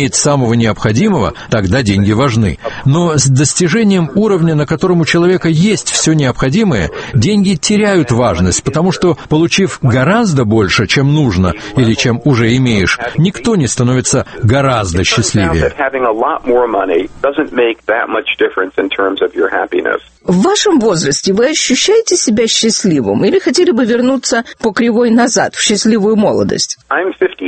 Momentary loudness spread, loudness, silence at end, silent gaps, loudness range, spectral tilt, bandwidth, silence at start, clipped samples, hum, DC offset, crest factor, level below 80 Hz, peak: 5 LU; -11 LUFS; 0 s; none; 3 LU; -4.5 dB/octave; 8.8 kHz; 0 s; under 0.1%; none; under 0.1%; 12 dB; -34 dBFS; 0 dBFS